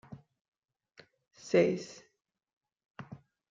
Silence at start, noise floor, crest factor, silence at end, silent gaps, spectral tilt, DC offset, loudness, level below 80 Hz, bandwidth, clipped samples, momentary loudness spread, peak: 0.1 s; -62 dBFS; 24 dB; 0.35 s; 0.41-0.52 s, 0.58-0.62 s, 2.57-2.61 s, 2.90-2.95 s; -6 dB/octave; under 0.1%; -30 LUFS; -76 dBFS; 7.8 kHz; under 0.1%; 26 LU; -14 dBFS